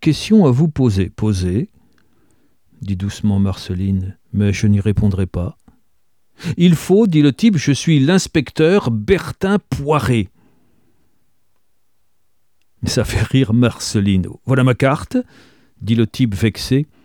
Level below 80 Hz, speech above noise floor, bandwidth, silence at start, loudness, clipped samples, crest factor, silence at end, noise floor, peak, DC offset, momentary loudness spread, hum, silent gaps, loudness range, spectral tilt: -38 dBFS; 54 dB; 18 kHz; 0 s; -16 LUFS; under 0.1%; 16 dB; 0.2 s; -70 dBFS; 0 dBFS; 0.2%; 10 LU; none; none; 7 LU; -6.5 dB/octave